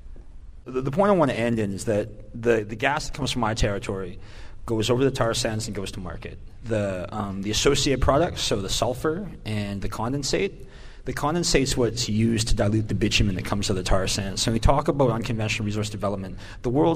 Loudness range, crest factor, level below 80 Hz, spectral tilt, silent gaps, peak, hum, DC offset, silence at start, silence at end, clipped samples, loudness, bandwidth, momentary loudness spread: 4 LU; 20 dB; -34 dBFS; -4.5 dB/octave; none; -6 dBFS; none; under 0.1%; 0.05 s; 0 s; under 0.1%; -24 LUFS; 15.5 kHz; 12 LU